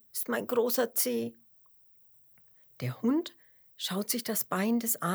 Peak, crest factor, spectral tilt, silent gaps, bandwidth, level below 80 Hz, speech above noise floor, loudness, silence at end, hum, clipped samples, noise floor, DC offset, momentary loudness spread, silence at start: -14 dBFS; 20 dB; -4 dB/octave; none; over 20 kHz; -84 dBFS; 31 dB; -30 LUFS; 0 s; none; under 0.1%; -61 dBFS; under 0.1%; 11 LU; 0.15 s